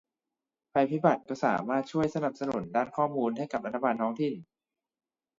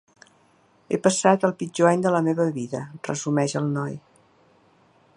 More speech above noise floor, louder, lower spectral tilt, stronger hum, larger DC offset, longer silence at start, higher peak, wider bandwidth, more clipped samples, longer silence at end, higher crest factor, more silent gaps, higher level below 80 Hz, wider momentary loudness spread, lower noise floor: first, 61 dB vs 38 dB; second, -30 LUFS vs -23 LUFS; first, -7.5 dB/octave vs -5.5 dB/octave; neither; neither; second, 0.75 s vs 0.9 s; second, -10 dBFS vs -2 dBFS; second, 7.6 kHz vs 11.5 kHz; neither; second, 0.95 s vs 1.2 s; about the same, 22 dB vs 22 dB; neither; about the same, -70 dBFS vs -70 dBFS; second, 6 LU vs 12 LU; first, -90 dBFS vs -60 dBFS